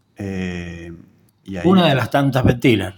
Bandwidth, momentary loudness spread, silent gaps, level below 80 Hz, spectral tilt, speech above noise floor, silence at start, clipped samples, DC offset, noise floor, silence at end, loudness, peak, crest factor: 17.5 kHz; 18 LU; none; -42 dBFS; -7 dB/octave; 32 dB; 0.2 s; under 0.1%; under 0.1%; -49 dBFS; 0.05 s; -17 LUFS; -2 dBFS; 18 dB